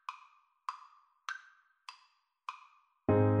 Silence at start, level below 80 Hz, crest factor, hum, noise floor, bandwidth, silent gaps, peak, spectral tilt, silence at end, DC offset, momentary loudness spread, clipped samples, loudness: 0.1 s; -64 dBFS; 20 dB; none; -71 dBFS; 8.4 kHz; none; -16 dBFS; -8 dB/octave; 0 s; under 0.1%; 24 LU; under 0.1%; -37 LUFS